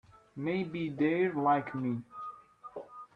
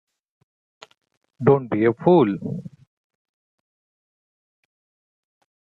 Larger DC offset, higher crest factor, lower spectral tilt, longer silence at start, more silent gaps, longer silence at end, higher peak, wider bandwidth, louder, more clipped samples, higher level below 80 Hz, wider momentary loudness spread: neither; about the same, 18 dB vs 22 dB; about the same, -9 dB/octave vs -10 dB/octave; second, 0.35 s vs 1.4 s; neither; second, 0.1 s vs 2.95 s; second, -16 dBFS vs -2 dBFS; first, 5.6 kHz vs 4.5 kHz; second, -32 LUFS vs -19 LUFS; neither; second, -72 dBFS vs -64 dBFS; first, 18 LU vs 14 LU